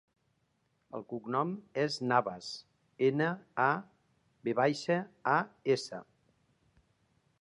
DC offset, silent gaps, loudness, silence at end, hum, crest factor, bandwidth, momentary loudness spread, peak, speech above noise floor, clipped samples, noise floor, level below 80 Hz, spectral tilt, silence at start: under 0.1%; none; -33 LUFS; 1.4 s; none; 22 dB; 11 kHz; 14 LU; -12 dBFS; 44 dB; under 0.1%; -76 dBFS; -80 dBFS; -5.5 dB/octave; 0.95 s